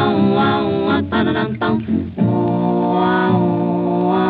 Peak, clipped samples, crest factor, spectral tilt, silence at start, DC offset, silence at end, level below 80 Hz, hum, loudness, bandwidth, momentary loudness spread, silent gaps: -2 dBFS; under 0.1%; 14 dB; -10.5 dB/octave; 0 s; under 0.1%; 0 s; -48 dBFS; none; -17 LUFS; 4.9 kHz; 4 LU; none